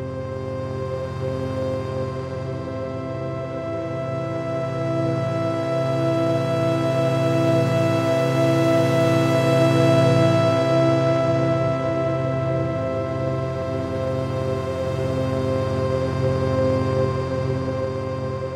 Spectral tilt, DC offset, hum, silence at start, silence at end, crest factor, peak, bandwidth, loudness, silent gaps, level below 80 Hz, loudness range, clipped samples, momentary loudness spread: -7.5 dB/octave; under 0.1%; none; 0 s; 0 s; 16 dB; -6 dBFS; 13.5 kHz; -22 LUFS; none; -48 dBFS; 9 LU; under 0.1%; 10 LU